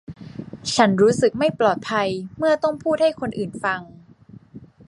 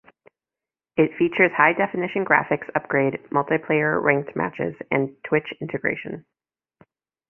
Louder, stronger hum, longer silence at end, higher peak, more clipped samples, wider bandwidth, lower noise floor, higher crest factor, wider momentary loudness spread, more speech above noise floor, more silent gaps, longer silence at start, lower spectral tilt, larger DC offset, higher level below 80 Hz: about the same, -21 LUFS vs -22 LUFS; neither; second, 0.2 s vs 1.1 s; about the same, -2 dBFS vs -2 dBFS; neither; first, 11.5 kHz vs 3.4 kHz; second, -47 dBFS vs under -90 dBFS; about the same, 20 dB vs 22 dB; first, 13 LU vs 10 LU; second, 27 dB vs over 68 dB; neither; second, 0.1 s vs 0.95 s; second, -5 dB/octave vs -9.5 dB/octave; neither; first, -56 dBFS vs -62 dBFS